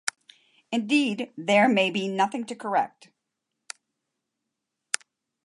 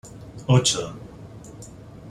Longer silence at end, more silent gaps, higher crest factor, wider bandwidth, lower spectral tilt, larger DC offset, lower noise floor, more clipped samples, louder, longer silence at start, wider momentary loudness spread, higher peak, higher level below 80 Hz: first, 0.5 s vs 0 s; neither; about the same, 24 dB vs 22 dB; about the same, 11.5 kHz vs 12.5 kHz; about the same, -3.5 dB/octave vs -4.5 dB/octave; neither; first, -83 dBFS vs -42 dBFS; neither; second, -25 LUFS vs -21 LUFS; about the same, 0.05 s vs 0.05 s; second, 20 LU vs 23 LU; about the same, -4 dBFS vs -4 dBFS; second, -78 dBFS vs -50 dBFS